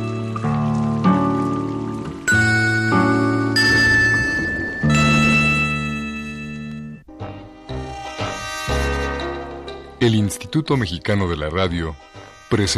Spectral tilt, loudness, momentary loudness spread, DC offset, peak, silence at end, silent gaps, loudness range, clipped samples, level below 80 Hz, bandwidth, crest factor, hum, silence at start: -5 dB/octave; -19 LUFS; 18 LU; under 0.1%; -4 dBFS; 0 s; none; 11 LU; under 0.1%; -36 dBFS; 14.5 kHz; 16 dB; none; 0 s